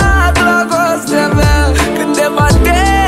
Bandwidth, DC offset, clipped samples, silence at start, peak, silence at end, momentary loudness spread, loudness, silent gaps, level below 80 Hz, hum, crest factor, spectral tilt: 15.5 kHz; under 0.1%; under 0.1%; 0 s; 0 dBFS; 0 s; 3 LU; -11 LUFS; none; -16 dBFS; none; 10 dB; -5 dB/octave